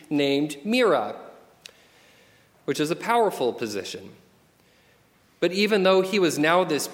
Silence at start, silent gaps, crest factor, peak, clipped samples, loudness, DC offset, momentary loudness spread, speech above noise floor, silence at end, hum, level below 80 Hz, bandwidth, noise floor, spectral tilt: 0.1 s; none; 20 dB; -4 dBFS; under 0.1%; -23 LUFS; under 0.1%; 14 LU; 37 dB; 0 s; none; -72 dBFS; 17 kHz; -60 dBFS; -4.5 dB/octave